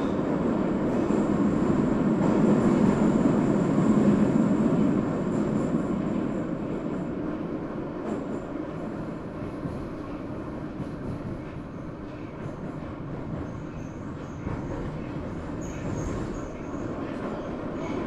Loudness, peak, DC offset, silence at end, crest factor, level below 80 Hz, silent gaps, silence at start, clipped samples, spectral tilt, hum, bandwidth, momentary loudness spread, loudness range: -28 LUFS; -10 dBFS; under 0.1%; 0 s; 18 dB; -46 dBFS; none; 0 s; under 0.1%; -8.5 dB/octave; none; 10.5 kHz; 14 LU; 13 LU